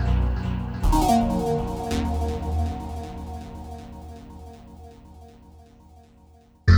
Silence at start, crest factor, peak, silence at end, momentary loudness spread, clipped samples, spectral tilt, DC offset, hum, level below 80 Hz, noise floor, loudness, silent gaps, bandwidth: 0 s; 20 dB; -6 dBFS; 0 s; 24 LU; under 0.1%; -7 dB/octave; under 0.1%; none; -30 dBFS; -53 dBFS; -26 LUFS; none; over 20 kHz